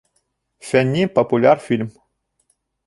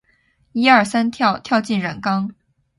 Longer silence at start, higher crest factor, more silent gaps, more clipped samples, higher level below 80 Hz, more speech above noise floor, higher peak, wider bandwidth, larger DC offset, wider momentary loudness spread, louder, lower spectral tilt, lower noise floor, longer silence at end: about the same, 0.65 s vs 0.55 s; about the same, 18 dB vs 18 dB; neither; neither; about the same, -58 dBFS vs -58 dBFS; first, 53 dB vs 44 dB; about the same, -2 dBFS vs 0 dBFS; about the same, 11.5 kHz vs 11.5 kHz; neither; about the same, 12 LU vs 10 LU; about the same, -17 LUFS vs -18 LUFS; first, -6.5 dB/octave vs -5 dB/octave; first, -69 dBFS vs -61 dBFS; first, 0.95 s vs 0.45 s